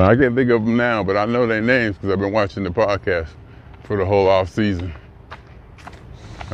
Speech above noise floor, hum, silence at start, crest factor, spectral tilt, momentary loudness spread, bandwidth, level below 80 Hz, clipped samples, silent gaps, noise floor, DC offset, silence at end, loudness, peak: 24 dB; none; 0 s; 18 dB; -7.5 dB/octave; 20 LU; 8.4 kHz; -44 dBFS; under 0.1%; none; -41 dBFS; under 0.1%; 0 s; -18 LUFS; 0 dBFS